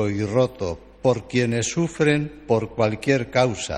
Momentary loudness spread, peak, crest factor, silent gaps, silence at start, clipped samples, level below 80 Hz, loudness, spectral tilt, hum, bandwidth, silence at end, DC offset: 4 LU; -4 dBFS; 18 dB; none; 0 s; under 0.1%; -48 dBFS; -22 LUFS; -5.5 dB/octave; none; 11.5 kHz; 0 s; under 0.1%